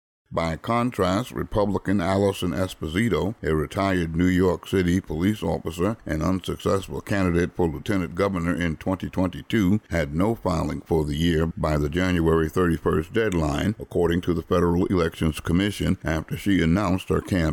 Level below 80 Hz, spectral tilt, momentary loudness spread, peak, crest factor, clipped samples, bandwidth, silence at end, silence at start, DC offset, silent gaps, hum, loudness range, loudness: -38 dBFS; -6.5 dB/octave; 5 LU; -10 dBFS; 12 dB; under 0.1%; 18 kHz; 0 s; 0.3 s; under 0.1%; none; none; 2 LU; -24 LUFS